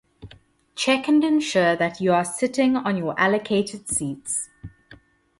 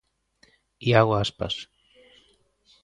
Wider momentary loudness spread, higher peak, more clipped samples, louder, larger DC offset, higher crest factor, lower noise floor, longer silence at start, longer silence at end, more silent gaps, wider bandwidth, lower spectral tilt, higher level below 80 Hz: second, 8 LU vs 13 LU; second, -6 dBFS vs -2 dBFS; neither; about the same, -22 LUFS vs -24 LUFS; neither; second, 18 dB vs 24 dB; second, -52 dBFS vs -64 dBFS; second, 0.2 s vs 0.8 s; second, 0.45 s vs 1.2 s; neither; first, 11.5 kHz vs 10 kHz; second, -4 dB/octave vs -6 dB/octave; about the same, -56 dBFS vs -52 dBFS